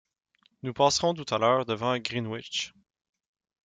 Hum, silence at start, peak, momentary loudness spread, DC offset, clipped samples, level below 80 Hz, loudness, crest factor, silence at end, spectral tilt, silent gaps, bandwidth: none; 0.65 s; -8 dBFS; 13 LU; under 0.1%; under 0.1%; -66 dBFS; -27 LUFS; 20 dB; 0.95 s; -4 dB/octave; none; 9.4 kHz